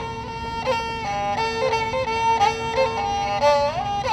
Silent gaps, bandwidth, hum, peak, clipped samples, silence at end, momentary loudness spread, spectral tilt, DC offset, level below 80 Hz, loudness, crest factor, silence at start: none; 13 kHz; none; -8 dBFS; under 0.1%; 0 s; 7 LU; -4 dB/octave; under 0.1%; -44 dBFS; -22 LUFS; 16 dB; 0 s